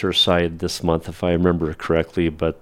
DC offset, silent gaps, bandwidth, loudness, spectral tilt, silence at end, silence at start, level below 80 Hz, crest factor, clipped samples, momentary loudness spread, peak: under 0.1%; none; 16 kHz; -20 LUFS; -5.5 dB/octave; 0.05 s; 0 s; -40 dBFS; 18 dB; under 0.1%; 7 LU; -2 dBFS